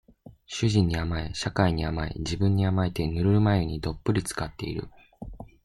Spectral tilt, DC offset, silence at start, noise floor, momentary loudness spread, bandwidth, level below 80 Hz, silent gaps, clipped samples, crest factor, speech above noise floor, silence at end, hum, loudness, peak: -6.5 dB/octave; under 0.1%; 0.25 s; -49 dBFS; 14 LU; 13 kHz; -42 dBFS; none; under 0.1%; 20 dB; 24 dB; 0.2 s; none; -27 LUFS; -6 dBFS